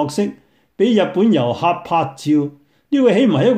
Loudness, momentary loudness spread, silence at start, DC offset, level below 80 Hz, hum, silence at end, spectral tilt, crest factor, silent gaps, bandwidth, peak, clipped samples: -17 LUFS; 8 LU; 0 s; under 0.1%; -60 dBFS; none; 0 s; -6.5 dB/octave; 14 dB; none; 13.5 kHz; -2 dBFS; under 0.1%